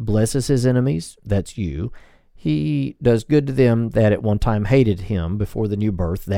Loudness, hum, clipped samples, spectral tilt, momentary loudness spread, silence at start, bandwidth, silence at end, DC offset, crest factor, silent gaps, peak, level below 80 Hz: -20 LUFS; none; under 0.1%; -7.5 dB/octave; 9 LU; 0 s; 16 kHz; 0 s; under 0.1%; 16 dB; none; -2 dBFS; -36 dBFS